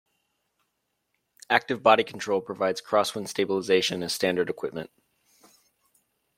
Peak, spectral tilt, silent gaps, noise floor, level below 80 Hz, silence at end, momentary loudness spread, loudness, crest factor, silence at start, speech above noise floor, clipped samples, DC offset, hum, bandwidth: -4 dBFS; -3.5 dB/octave; none; -78 dBFS; -72 dBFS; 1.5 s; 10 LU; -25 LUFS; 24 dB; 1.5 s; 53 dB; under 0.1%; under 0.1%; none; 16.5 kHz